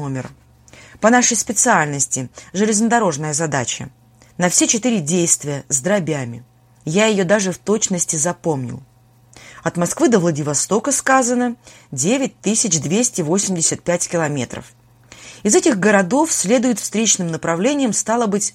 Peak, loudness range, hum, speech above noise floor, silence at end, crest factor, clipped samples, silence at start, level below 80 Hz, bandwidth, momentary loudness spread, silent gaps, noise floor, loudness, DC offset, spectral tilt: 0 dBFS; 3 LU; none; 30 dB; 0.05 s; 18 dB; under 0.1%; 0 s; -56 dBFS; 16 kHz; 11 LU; none; -48 dBFS; -17 LUFS; under 0.1%; -3.5 dB/octave